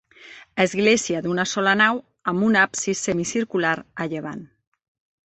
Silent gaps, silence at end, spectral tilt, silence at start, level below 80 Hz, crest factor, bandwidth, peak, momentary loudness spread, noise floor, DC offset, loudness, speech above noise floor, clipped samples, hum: none; 0.8 s; -3.5 dB/octave; 0.2 s; -60 dBFS; 20 dB; 8.6 kHz; -4 dBFS; 11 LU; -46 dBFS; under 0.1%; -21 LUFS; 25 dB; under 0.1%; none